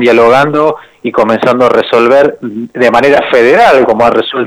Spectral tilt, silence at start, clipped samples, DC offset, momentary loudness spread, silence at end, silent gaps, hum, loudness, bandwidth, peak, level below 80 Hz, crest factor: -5.5 dB/octave; 0 s; 0.2%; under 0.1%; 8 LU; 0 s; none; none; -7 LUFS; 14 kHz; 0 dBFS; -44 dBFS; 8 dB